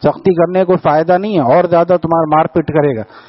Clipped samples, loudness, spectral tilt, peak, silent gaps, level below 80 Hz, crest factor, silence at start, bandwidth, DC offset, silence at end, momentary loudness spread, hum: under 0.1%; -12 LUFS; -7 dB/octave; 0 dBFS; none; -48 dBFS; 12 dB; 0 s; 5.8 kHz; under 0.1%; 0.1 s; 3 LU; none